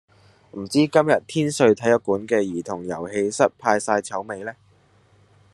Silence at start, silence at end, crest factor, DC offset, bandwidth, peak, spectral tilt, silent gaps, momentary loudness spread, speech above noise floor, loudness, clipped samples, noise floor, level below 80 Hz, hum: 0.55 s; 1 s; 20 dB; under 0.1%; 12.5 kHz; -2 dBFS; -5 dB/octave; none; 14 LU; 36 dB; -21 LUFS; under 0.1%; -57 dBFS; -66 dBFS; none